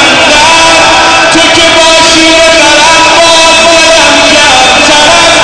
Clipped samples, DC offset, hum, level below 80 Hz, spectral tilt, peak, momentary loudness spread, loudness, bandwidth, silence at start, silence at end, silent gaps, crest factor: 0.1%; under 0.1%; none; -28 dBFS; -1 dB/octave; 0 dBFS; 1 LU; -1 LUFS; 11 kHz; 0 s; 0 s; none; 2 dB